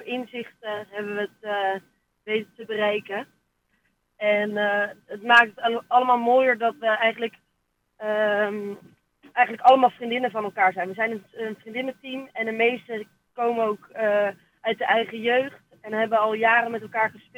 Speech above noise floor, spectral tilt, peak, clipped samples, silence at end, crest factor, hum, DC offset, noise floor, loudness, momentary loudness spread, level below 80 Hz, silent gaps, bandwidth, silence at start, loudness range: 50 dB; -5 dB/octave; -4 dBFS; under 0.1%; 0.2 s; 20 dB; none; under 0.1%; -73 dBFS; -23 LUFS; 15 LU; -76 dBFS; none; 16 kHz; 0 s; 7 LU